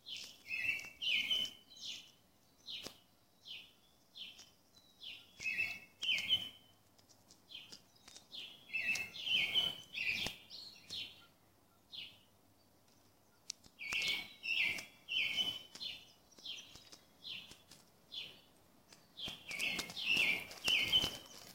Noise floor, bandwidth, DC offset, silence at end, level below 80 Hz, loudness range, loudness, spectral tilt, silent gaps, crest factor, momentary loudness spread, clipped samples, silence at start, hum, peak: -70 dBFS; 16.5 kHz; under 0.1%; 0 s; -72 dBFS; 13 LU; -37 LUFS; -0.5 dB/octave; none; 24 dB; 20 LU; under 0.1%; 0.05 s; none; -18 dBFS